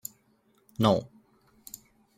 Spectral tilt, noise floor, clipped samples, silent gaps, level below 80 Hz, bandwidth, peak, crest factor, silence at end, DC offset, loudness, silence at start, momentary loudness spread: -6 dB/octave; -67 dBFS; under 0.1%; none; -64 dBFS; 16 kHz; -6 dBFS; 26 dB; 1.15 s; under 0.1%; -27 LUFS; 0.8 s; 25 LU